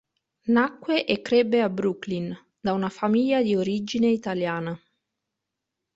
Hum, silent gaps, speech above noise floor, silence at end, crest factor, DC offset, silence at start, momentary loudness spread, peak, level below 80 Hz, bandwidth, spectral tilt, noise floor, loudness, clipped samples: none; none; 61 dB; 1.2 s; 18 dB; under 0.1%; 0.45 s; 10 LU; -6 dBFS; -64 dBFS; 7.8 kHz; -6.5 dB/octave; -84 dBFS; -24 LUFS; under 0.1%